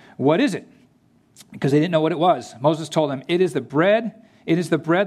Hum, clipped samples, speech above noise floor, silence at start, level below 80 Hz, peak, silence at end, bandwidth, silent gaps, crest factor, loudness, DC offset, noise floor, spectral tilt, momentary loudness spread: none; under 0.1%; 39 dB; 0.2 s; -70 dBFS; -4 dBFS; 0 s; 13 kHz; none; 18 dB; -20 LUFS; under 0.1%; -58 dBFS; -6.5 dB/octave; 6 LU